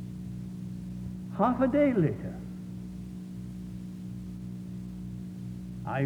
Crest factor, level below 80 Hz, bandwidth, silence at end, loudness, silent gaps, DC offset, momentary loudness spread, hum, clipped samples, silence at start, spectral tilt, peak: 20 dB; -52 dBFS; 17 kHz; 0 s; -33 LUFS; none; under 0.1%; 16 LU; 60 Hz at -55 dBFS; under 0.1%; 0 s; -9 dB/octave; -12 dBFS